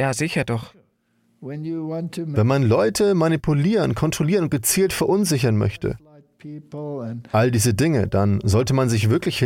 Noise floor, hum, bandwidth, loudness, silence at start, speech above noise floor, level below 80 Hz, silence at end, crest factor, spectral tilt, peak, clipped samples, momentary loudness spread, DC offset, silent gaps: -65 dBFS; none; 17 kHz; -20 LUFS; 0 s; 45 dB; -46 dBFS; 0 s; 14 dB; -5.5 dB/octave; -6 dBFS; under 0.1%; 13 LU; under 0.1%; none